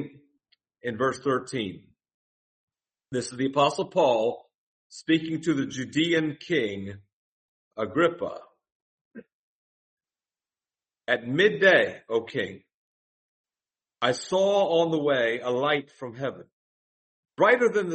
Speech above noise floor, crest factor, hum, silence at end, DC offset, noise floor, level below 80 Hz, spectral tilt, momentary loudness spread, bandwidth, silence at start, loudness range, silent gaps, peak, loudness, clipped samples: over 65 dB; 22 dB; none; 0 s; under 0.1%; under -90 dBFS; -70 dBFS; -5 dB/octave; 15 LU; 8.4 kHz; 0 s; 7 LU; 2.14-2.68 s, 4.54-4.90 s, 7.13-7.71 s, 8.72-9.11 s, 9.32-9.97 s, 12.74-13.44 s, 16.53-17.23 s; -6 dBFS; -25 LUFS; under 0.1%